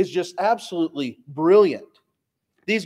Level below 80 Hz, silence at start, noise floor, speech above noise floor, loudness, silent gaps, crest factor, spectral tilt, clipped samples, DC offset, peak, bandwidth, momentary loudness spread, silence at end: -76 dBFS; 0 s; -77 dBFS; 57 dB; -21 LUFS; none; 18 dB; -5.5 dB/octave; under 0.1%; under 0.1%; -4 dBFS; 12 kHz; 15 LU; 0 s